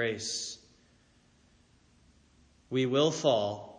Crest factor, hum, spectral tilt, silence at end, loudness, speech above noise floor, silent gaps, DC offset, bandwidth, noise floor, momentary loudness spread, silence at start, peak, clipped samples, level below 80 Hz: 20 dB; none; -4 dB/octave; 0 s; -30 LUFS; 35 dB; none; under 0.1%; 10 kHz; -65 dBFS; 12 LU; 0 s; -14 dBFS; under 0.1%; -70 dBFS